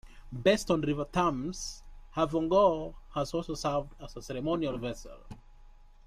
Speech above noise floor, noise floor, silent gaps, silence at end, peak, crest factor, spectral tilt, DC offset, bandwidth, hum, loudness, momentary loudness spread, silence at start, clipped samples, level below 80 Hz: 23 dB; -53 dBFS; none; 0.2 s; -12 dBFS; 20 dB; -5.5 dB/octave; under 0.1%; 15 kHz; none; -31 LUFS; 19 LU; 0.05 s; under 0.1%; -48 dBFS